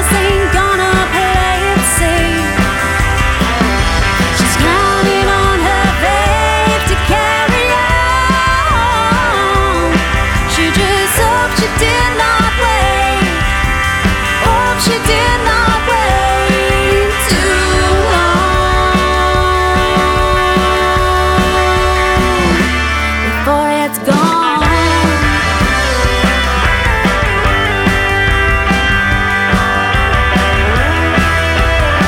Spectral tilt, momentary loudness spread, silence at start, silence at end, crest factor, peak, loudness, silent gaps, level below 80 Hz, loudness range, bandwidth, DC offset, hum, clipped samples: -4 dB/octave; 2 LU; 0 s; 0 s; 12 dB; 0 dBFS; -11 LUFS; none; -18 dBFS; 1 LU; 18.5 kHz; under 0.1%; none; under 0.1%